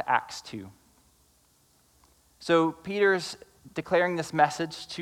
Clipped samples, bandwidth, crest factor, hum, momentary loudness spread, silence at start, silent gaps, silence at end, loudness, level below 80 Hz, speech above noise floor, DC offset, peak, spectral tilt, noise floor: under 0.1%; 16 kHz; 20 dB; none; 17 LU; 0 s; none; 0 s; -27 LUFS; -68 dBFS; 37 dB; under 0.1%; -8 dBFS; -4.5 dB/octave; -64 dBFS